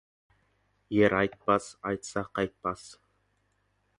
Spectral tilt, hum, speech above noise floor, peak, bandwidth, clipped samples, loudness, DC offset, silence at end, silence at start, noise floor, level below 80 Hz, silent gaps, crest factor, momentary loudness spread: -5.5 dB/octave; 50 Hz at -50 dBFS; 44 dB; -8 dBFS; 11.5 kHz; under 0.1%; -29 LUFS; under 0.1%; 1.05 s; 0.9 s; -73 dBFS; -60 dBFS; none; 22 dB; 11 LU